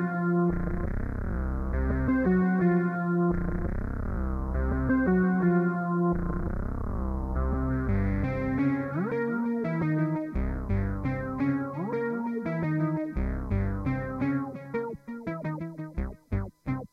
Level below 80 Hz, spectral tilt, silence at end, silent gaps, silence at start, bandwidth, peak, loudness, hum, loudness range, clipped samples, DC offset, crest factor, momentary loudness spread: -36 dBFS; -10.5 dB/octave; 0.05 s; none; 0 s; 5 kHz; -14 dBFS; -29 LUFS; none; 4 LU; under 0.1%; under 0.1%; 14 dB; 10 LU